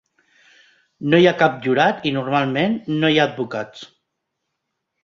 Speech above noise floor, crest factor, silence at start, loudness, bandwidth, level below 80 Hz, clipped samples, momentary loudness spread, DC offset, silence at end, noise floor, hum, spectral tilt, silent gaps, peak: 59 dB; 18 dB; 1 s; -18 LUFS; 7.2 kHz; -62 dBFS; under 0.1%; 14 LU; under 0.1%; 1.2 s; -77 dBFS; none; -6.5 dB/octave; none; -2 dBFS